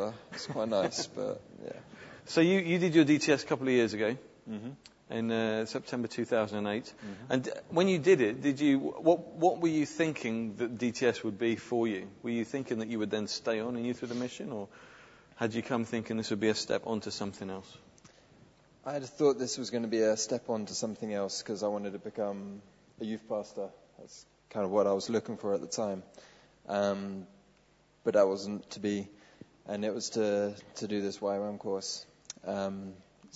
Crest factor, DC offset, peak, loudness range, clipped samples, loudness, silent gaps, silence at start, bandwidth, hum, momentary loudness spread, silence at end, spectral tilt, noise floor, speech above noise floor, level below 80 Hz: 20 dB; under 0.1%; -12 dBFS; 7 LU; under 0.1%; -32 LUFS; none; 0 s; 8 kHz; none; 15 LU; 0.1 s; -5 dB/octave; -66 dBFS; 34 dB; -72 dBFS